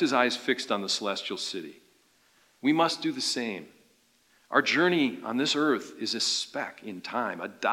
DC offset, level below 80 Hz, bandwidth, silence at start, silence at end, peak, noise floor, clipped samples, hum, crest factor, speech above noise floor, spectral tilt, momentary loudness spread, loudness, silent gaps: under 0.1%; -86 dBFS; 16.5 kHz; 0 s; 0 s; -6 dBFS; -65 dBFS; under 0.1%; none; 22 dB; 37 dB; -3 dB/octave; 11 LU; -28 LUFS; none